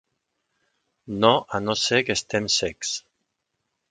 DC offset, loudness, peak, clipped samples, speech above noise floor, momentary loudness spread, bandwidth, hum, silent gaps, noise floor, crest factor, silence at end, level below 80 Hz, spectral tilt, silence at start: under 0.1%; -22 LUFS; 0 dBFS; under 0.1%; 55 dB; 10 LU; 9.6 kHz; none; none; -78 dBFS; 26 dB; 0.9 s; -58 dBFS; -3 dB/octave; 1.05 s